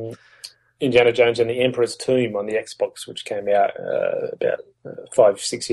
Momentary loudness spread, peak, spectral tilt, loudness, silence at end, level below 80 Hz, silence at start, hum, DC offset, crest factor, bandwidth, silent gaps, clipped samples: 21 LU; -2 dBFS; -4.5 dB/octave; -21 LUFS; 0 s; -62 dBFS; 0 s; none; under 0.1%; 18 dB; 12.5 kHz; none; under 0.1%